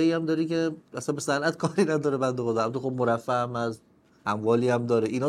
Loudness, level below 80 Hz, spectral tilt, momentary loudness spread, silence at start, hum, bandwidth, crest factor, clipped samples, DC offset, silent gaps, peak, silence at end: -27 LUFS; -70 dBFS; -6 dB/octave; 8 LU; 0 s; none; 13 kHz; 16 dB; under 0.1%; under 0.1%; none; -10 dBFS; 0 s